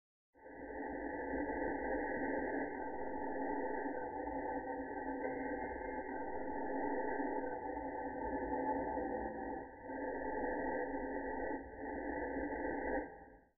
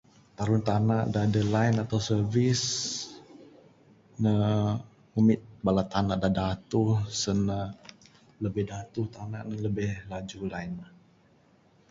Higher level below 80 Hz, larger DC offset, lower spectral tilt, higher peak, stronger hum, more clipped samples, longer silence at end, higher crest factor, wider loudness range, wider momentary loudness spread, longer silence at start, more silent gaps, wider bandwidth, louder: second, -60 dBFS vs -52 dBFS; neither; second, -0.5 dB/octave vs -6 dB/octave; second, -26 dBFS vs -10 dBFS; neither; neither; second, 0 s vs 1.05 s; about the same, 16 dB vs 18 dB; second, 1 LU vs 8 LU; second, 6 LU vs 12 LU; about the same, 0.3 s vs 0.4 s; neither; second, 2.2 kHz vs 8 kHz; second, -41 LUFS vs -28 LUFS